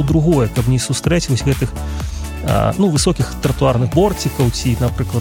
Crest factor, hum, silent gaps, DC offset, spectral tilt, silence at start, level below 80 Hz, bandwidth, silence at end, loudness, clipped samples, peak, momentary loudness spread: 14 dB; none; none; under 0.1%; -6 dB/octave; 0 s; -26 dBFS; 17 kHz; 0 s; -17 LUFS; under 0.1%; -2 dBFS; 8 LU